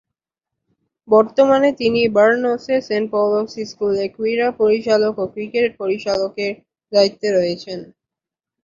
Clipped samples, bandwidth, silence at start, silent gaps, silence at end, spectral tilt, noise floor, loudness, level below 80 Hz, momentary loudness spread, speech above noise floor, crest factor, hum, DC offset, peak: under 0.1%; 7.6 kHz; 1.1 s; none; 0.8 s; -5 dB/octave; -87 dBFS; -18 LUFS; -58 dBFS; 11 LU; 70 dB; 16 dB; none; under 0.1%; -2 dBFS